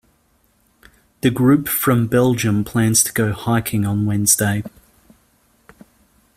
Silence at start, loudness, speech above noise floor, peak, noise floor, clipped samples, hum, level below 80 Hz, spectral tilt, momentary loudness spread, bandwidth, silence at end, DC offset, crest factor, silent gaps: 1.25 s; -17 LUFS; 43 dB; 0 dBFS; -60 dBFS; under 0.1%; none; -48 dBFS; -4.5 dB/octave; 6 LU; 16 kHz; 1.7 s; under 0.1%; 20 dB; none